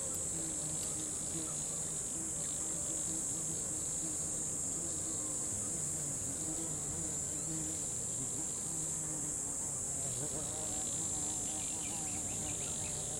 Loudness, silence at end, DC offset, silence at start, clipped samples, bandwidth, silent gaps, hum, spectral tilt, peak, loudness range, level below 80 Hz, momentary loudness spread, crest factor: -35 LUFS; 0 s; under 0.1%; 0 s; under 0.1%; 16 kHz; none; none; -2.5 dB/octave; -24 dBFS; 1 LU; -58 dBFS; 1 LU; 14 dB